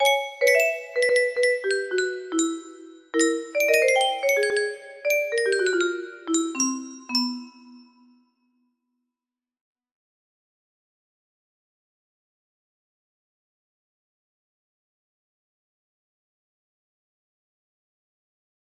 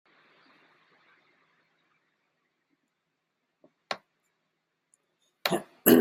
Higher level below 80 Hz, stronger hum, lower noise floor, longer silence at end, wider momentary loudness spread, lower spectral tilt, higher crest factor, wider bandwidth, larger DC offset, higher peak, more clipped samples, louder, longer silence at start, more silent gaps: second, -76 dBFS vs -70 dBFS; neither; first, -90 dBFS vs -81 dBFS; first, 10.95 s vs 0 s; second, 10 LU vs 16 LU; second, 0 dB/octave vs -3.5 dB/octave; second, 20 dB vs 28 dB; about the same, 15 kHz vs 15.5 kHz; neither; about the same, -6 dBFS vs -4 dBFS; neither; first, -23 LUFS vs -29 LUFS; second, 0 s vs 3.9 s; neither